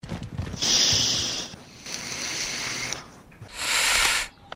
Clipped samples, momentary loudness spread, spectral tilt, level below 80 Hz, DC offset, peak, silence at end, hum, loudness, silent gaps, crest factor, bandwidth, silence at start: under 0.1%; 16 LU; -0.5 dB/octave; -48 dBFS; under 0.1%; -8 dBFS; 0 s; none; -23 LUFS; none; 18 dB; 16 kHz; 0.05 s